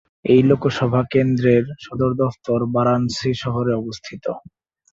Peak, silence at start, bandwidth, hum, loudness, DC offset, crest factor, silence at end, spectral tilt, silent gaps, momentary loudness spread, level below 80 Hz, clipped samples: -2 dBFS; 0.25 s; 7.8 kHz; none; -19 LUFS; under 0.1%; 16 dB; 0.55 s; -7.5 dB/octave; none; 13 LU; -50 dBFS; under 0.1%